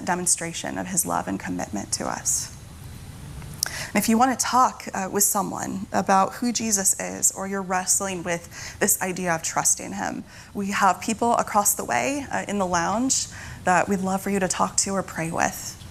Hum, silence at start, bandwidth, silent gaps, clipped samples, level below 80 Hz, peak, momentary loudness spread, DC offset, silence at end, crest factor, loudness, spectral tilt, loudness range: none; 0 s; 16 kHz; none; under 0.1%; -52 dBFS; 0 dBFS; 11 LU; under 0.1%; 0 s; 24 dB; -23 LUFS; -3 dB/octave; 4 LU